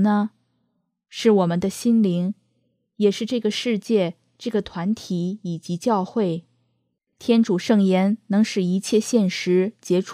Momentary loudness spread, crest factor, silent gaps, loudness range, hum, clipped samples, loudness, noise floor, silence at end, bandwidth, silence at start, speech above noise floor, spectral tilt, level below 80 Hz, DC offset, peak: 10 LU; 16 dB; none; 4 LU; none; under 0.1%; -22 LUFS; -72 dBFS; 0 s; 14.5 kHz; 0 s; 52 dB; -6 dB/octave; -64 dBFS; under 0.1%; -4 dBFS